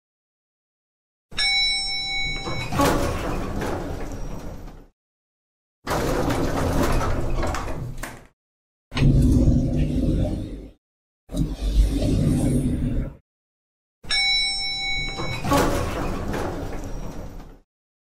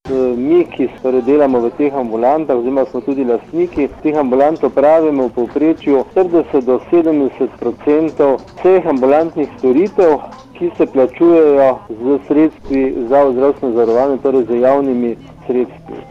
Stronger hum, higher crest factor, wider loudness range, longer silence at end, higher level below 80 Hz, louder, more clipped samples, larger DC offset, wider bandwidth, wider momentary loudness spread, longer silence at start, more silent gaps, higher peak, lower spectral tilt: neither; about the same, 16 dB vs 12 dB; about the same, 4 LU vs 2 LU; first, 0.6 s vs 0.1 s; first, -30 dBFS vs -46 dBFS; second, -23 LUFS vs -14 LUFS; neither; neither; first, 16 kHz vs 7 kHz; first, 17 LU vs 7 LU; first, 1.3 s vs 0.05 s; first, 4.93-5.82 s, 8.33-8.91 s, 10.78-11.27 s, 13.21-14.01 s vs none; second, -8 dBFS vs -2 dBFS; second, -5 dB/octave vs -8.5 dB/octave